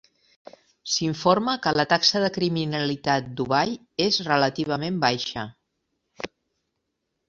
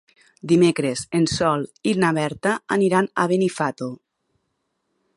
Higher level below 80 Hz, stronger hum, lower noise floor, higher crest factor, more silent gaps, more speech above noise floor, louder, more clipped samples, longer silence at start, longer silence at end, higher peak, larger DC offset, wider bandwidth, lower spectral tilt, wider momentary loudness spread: about the same, -60 dBFS vs -56 dBFS; neither; first, -79 dBFS vs -74 dBFS; about the same, 22 dB vs 18 dB; neither; about the same, 55 dB vs 54 dB; about the same, -23 LUFS vs -21 LUFS; neither; first, 0.85 s vs 0.45 s; second, 1 s vs 1.2 s; about the same, -4 dBFS vs -4 dBFS; neither; second, 7.8 kHz vs 11.5 kHz; second, -4 dB/octave vs -5.5 dB/octave; first, 17 LU vs 8 LU